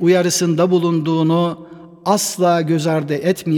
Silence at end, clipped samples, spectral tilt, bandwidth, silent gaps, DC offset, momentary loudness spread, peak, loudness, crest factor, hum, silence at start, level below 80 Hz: 0 s; under 0.1%; -5.5 dB/octave; 18.5 kHz; none; under 0.1%; 4 LU; -2 dBFS; -17 LUFS; 14 dB; none; 0 s; -64 dBFS